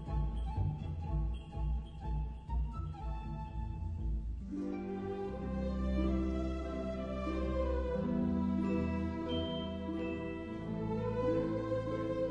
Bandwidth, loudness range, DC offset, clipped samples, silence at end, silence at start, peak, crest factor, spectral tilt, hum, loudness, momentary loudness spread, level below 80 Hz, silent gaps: 7.6 kHz; 5 LU; under 0.1%; under 0.1%; 0 s; 0 s; -22 dBFS; 14 dB; -8.5 dB/octave; none; -38 LUFS; 7 LU; -42 dBFS; none